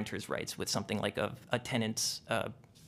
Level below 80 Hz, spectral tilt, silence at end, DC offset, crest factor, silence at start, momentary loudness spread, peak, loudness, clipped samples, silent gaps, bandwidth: -68 dBFS; -3.5 dB/octave; 0 s; under 0.1%; 22 dB; 0 s; 5 LU; -14 dBFS; -35 LUFS; under 0.1%; none; 15.5 kHz